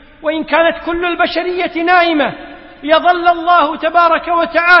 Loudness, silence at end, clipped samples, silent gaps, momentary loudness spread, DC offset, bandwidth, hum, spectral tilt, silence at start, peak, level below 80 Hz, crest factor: -13 LUFS; 0 s; under 0.1%; none; 8 LU; under 0.1%; 5.8 kHz; none; -5.5 dB/octave; 0.2 s; 0 dBFS; -44 dBFS; 12 dB